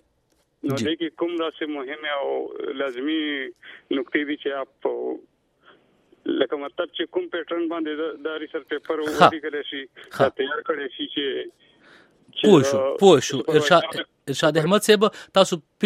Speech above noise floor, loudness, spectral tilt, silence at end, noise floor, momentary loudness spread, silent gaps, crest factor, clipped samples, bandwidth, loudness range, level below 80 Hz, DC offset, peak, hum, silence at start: 45 dB; -23 LUFS; -4.5 dB/octave; 0 s; -67 dBFS; 14 LU; none; 22 dB; under 0.1%; 16 kHz; 9 LU; -66 dBFS; under 0.1%; 0 dBFS; none; 0.65 s